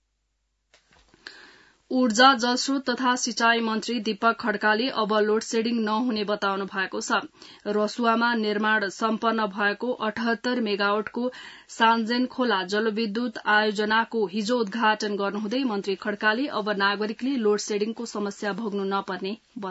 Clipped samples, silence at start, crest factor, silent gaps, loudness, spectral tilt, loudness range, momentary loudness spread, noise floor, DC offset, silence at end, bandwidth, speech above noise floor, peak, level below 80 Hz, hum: under 0.1%; 1.25 s; 20 dB; none; -24 LUFS; -3.5 dB/octave; 3 LU; 8 LU; -75 dBFS; under 0.1%; 0 s; 8 kHz; 50 dB; -4 dBFS; -72 dBFS; none